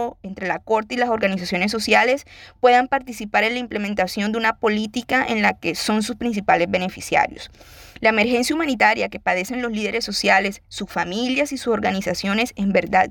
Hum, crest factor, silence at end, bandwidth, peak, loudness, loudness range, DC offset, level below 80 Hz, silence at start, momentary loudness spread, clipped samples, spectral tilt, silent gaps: none; 18 dB; 0 s; 19.5 kHz; -4 dBFS; -20 LUFS; 2 LU; under 0.1%; -50 dBFS; 0 s; 8 LU; under 0.1%; -4 dB/octave; none